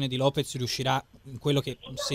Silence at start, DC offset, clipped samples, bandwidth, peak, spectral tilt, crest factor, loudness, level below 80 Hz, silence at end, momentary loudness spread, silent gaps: 0 s; under 0.1%; under 0.1%; 16 kHz; -10 dBFS; -5 dB/octave; 18 dB; -29 LUFS; -56 dBFS; 0 s; 8 LU; none